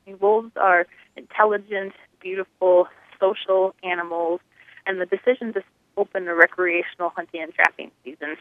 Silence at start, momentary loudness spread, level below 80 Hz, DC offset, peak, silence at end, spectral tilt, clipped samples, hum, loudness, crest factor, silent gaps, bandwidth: 0.1 s; 14 LU; -78 dBFS; under 0.1%; 0 dBFS; 0.05 s; -5.5 dB/octave; under 0.1%; none; -22 LUFS; 22 dB; none; 9.2 kHz